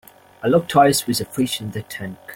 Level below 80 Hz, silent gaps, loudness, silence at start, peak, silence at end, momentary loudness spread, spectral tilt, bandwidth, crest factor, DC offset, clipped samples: -56 dBFS; none; -19 LUFS; 0.4 s; -2 dBFS; 0 s; 15 LU; -4.5 dB/octave; 17 kHz; 18 dB; under 0.1%; under 0.1%